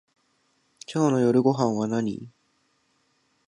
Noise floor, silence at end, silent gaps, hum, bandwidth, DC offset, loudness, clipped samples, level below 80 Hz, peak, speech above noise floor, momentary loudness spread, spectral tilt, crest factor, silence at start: -69 dBFS; 1.2 s; none; none; 10.5 kHz; under 0.1%; -24 LUFS; under 0.1%; -68 dBFS; -8 dBFS; 46 dB; 15 LU; -7 dB/octave; 20 dB; 0.9 s